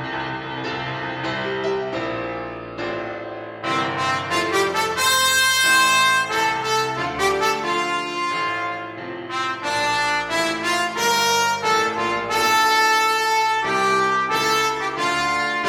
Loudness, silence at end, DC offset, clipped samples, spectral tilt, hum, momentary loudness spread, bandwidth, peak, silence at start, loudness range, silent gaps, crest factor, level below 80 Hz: -20 LUFS; 0 s; under 0.1%; under 0.1%; -2 dB/octave; none; 12 LU; 16.5 kHz; -6 dBFS; 0 s; 8 LU; none; 16 dB; -54 dBFS